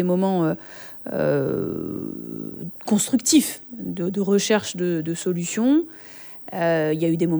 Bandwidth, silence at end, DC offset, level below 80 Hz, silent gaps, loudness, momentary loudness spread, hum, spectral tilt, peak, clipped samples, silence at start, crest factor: over 20 kHz; 0 s; under 0.1%; -62 dBFS; none; -23 LUFS; 14 LU; none; -5 dB/octave; -6 dBFS; under 0.1%; 0 s; 18 dB